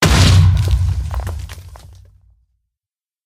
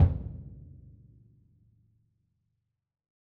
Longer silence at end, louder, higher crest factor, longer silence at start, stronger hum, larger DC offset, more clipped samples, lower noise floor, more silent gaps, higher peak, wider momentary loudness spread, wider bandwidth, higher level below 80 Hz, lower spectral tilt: second, 1.4 s vs 2.75 s; first, -14 LUFS vs -33 LUFS; second, 16 dB vs 24 dB; about the same, 0 s vs 0 s; neither; neither; neither; first, under -90 dBFS vs -81 dBFS; neither; first, 0 dBFS vs -10 dBFS; second, 21 LU vs 24 LU; first, 15.5 kHz vs 2.4 kHz; first, -22 dBFS vs -42 dBFS; second, -5 dB/octave vs -11 dB/octave